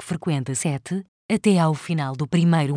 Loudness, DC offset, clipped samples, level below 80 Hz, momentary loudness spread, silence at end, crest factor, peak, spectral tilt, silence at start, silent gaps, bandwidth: -23 LUFS; under 0.1%; under 0.1%; -62 dBFS; 9 LU; 0 s; 16 dB; -6 dBFS; -6 dB/octave; 0 s; 1.08-1.29 s; 10.5 kHz